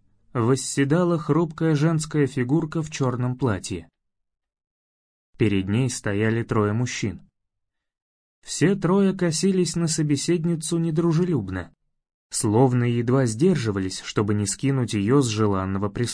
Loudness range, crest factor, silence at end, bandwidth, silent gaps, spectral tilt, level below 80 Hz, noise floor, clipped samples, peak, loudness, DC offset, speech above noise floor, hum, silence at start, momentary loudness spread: 5 LU; 18 dB; 0 s; 10.5 kHz; 4.67-5.33 s, 8.02-8.42 s, 12.14-12.30 s; -6 dB/octave; -54 dBFS; -80 dBFS; under 0.1%; -6 dBFS; -23 LUFS; under 0.1%; 58 dB; none; 0.35 s; 8 LU